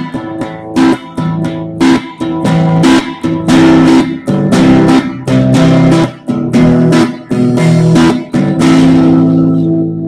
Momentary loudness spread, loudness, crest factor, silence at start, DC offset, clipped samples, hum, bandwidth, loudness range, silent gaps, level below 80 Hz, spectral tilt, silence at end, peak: 10 LU; -9 LUFS; 8 dB; 0 s; under 0.1%; 0.2%; none; 11.5 kHz; 2 LU; none; -36 dBFS; -7 dB/octave; 0 s; 0 dBFS